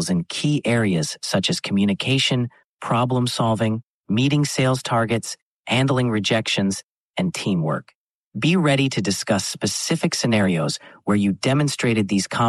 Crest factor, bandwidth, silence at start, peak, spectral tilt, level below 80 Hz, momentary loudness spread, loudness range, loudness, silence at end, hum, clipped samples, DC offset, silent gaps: 16 dB; 12.5 kHz; 0 s; -6 dBFS; -5 dB/octave; -58 dBFS; 7 LU; 1 LU; -21 LUFS; 0 s; none; under 0.1%; under 0.1%; 2.64-2.77 s, 3.83-4.04 s, 5.42-5.64 s, 6.84-7.14 s, 7.95-8.32 s